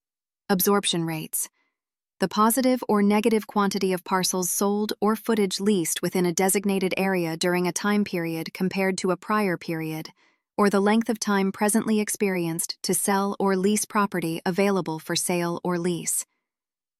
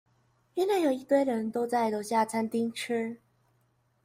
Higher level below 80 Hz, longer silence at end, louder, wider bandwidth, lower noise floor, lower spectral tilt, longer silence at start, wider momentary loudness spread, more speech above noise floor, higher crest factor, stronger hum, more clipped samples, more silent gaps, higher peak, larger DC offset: first, -68 dBFS vs -76 dBFS; second, 0.75 s vs 0.9 s; first, -24 LUFS vs -29 LUFS; about the same, 16 kHz vs 16 kHz; first, under -90 dBFS vs -71 dBFS; about the same, -4 dB/octave vs -4.5 dB/octave; about the same, 0.5 s vs 0.55 s; about the same, 7 LU vs 7 LU; first, over 66 dB vs 42 dB; about the same, 16 dB vs 16 dB; neither; neither; neither; first, -8 dBFS vs -14 dBFS; neither